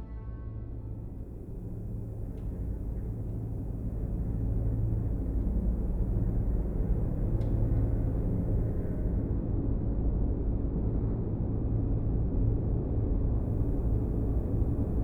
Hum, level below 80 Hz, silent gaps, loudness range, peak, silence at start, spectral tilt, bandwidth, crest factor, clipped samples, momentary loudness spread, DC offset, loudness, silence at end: none; -32 dBFS; none; 7 LU; -16 dBFS; 0 s; -12 dB/octave; 2.2 kHz; 14 dB; under 0.1%; 10 LU; under 0.1%; -32 LUFS; 0 s